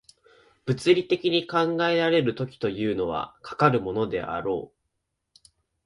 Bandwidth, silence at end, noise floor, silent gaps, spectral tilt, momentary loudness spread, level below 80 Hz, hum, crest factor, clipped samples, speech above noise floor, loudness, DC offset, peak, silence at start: 11.5 kHz; 1.2 s; -79 dBFS; none; -6.5 dB/octave; 10 LU; -58 dBFS; none; 20 dB; under 0.1%; 55 dB; -25 LUFS; under 0.1%; -6 dBFS; 0.65 s